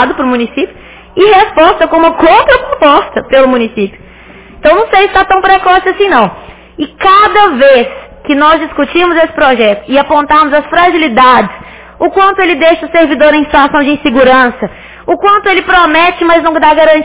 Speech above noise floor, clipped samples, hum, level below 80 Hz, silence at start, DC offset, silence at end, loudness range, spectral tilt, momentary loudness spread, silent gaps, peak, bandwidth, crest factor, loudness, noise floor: 26 dB; 3%; none; -36 dBFS; 0 s; 0.8%; 0 s; 1 LU; -8 dB/octave; 10 LU; none; 0 dBFS; 4 kHz; 8 dB; -7 LUFS; -33 dBFS